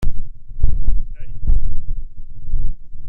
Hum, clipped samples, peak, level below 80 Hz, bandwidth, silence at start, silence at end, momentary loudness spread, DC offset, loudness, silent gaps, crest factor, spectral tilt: none; under 0.1%; 0 dBFS; -18 dBFS; 0.7 kHz; 0 s; 0 s; 14 LU; under 0.1%; -28 LUFS; none; 12 dB; -9 dB/octave